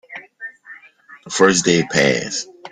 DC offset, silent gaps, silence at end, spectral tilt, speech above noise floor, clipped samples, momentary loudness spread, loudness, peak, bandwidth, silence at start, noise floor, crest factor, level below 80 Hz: under 0.1%; none; 0.05 s; -3.5 dB/octave; 29 dB; under 0.1%; 21 LU; -16 LUFS; 0 dBFS; 11 kHz; 0.1 s; -45 dBFS; 20 dB; -56 dBFS